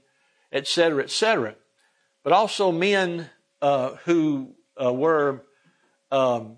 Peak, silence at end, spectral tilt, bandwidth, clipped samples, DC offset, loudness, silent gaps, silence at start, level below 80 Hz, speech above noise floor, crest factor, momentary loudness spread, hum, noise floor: -4 dBFS; 0.05 s; -4.5 dB/octave; 11 kHz; under 0.1%; under 0.1%; -23 LUFS; none; 0.55 s; -78 dBFS; 45 dB; 20 dB; 12 LU; none; -67 dBFS